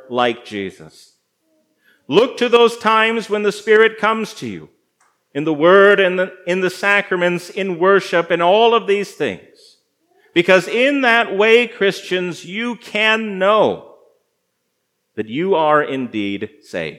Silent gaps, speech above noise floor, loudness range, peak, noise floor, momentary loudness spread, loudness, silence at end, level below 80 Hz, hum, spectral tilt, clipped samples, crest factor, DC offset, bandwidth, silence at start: none; 55 dB; 4 LU; 0 dBFS; -71 dBFS; 14 LU; -15 LUFS; 0 s; -72 dBFS; none; -4.5 dB/octave; under 0.1%; 16 dB; under 0.1%; 14 kHz; 0.1 s